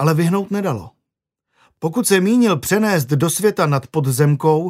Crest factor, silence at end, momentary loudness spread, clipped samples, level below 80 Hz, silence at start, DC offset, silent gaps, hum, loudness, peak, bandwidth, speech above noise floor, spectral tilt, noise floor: 16 dB; 0 s; 8 LU; under 0.1%; -56 dBFS; 0 s; under 0.1%; none; none; -17 LUFS; 0 dBFS; 16 kHz; 64 dB; -5.5 dB/octave; -81 dBFS